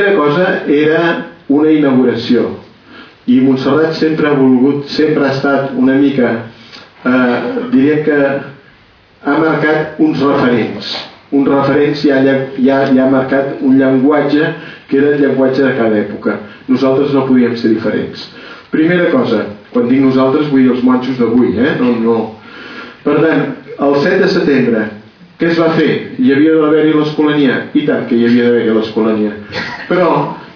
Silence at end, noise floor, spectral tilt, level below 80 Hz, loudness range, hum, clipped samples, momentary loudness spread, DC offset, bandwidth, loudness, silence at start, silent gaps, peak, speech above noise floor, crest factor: 0.05 s; -45 dBFS; -8 dB/octave; -52 dBFS; 2 LU; none; under 0.1%; 10 LU; under 0.1%; 5.4 kHz; -12 LUFS; 0 s; none; 0 dBFS; 34 dB; 10 dB